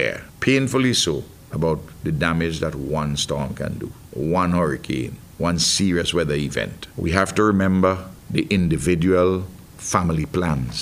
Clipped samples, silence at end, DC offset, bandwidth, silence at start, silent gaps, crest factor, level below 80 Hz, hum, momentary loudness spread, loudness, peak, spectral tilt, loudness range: under 0.1%; 0 s; under 0.1%; 16 kHz; 0 s; none; 20 dB; -40 dBFS; none; 11 LU; -21 LUFS; -2 dBFS; -5 dB/octave; 4 LU